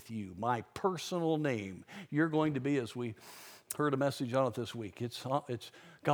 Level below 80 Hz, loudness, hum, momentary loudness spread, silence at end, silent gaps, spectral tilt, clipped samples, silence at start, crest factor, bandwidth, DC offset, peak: -74 dBFS; -35 LUFS; none; 12 LU; 0 s; none; -6 dB/octave; under 0.1%; 0 s; 20 dB; over 20 kHz; under 0.1%; -14 dBFS